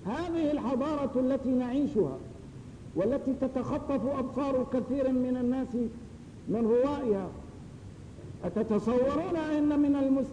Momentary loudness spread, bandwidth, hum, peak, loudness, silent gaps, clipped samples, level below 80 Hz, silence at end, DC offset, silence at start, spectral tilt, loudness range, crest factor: 19 LU; 10 kHz; none; -16 dBFS; -30 LUFS; none; under 0.1%; -54 dBFS; 0 s; under 0.1%; 0 s; -8 dB/octave; 2 LU; 14 dB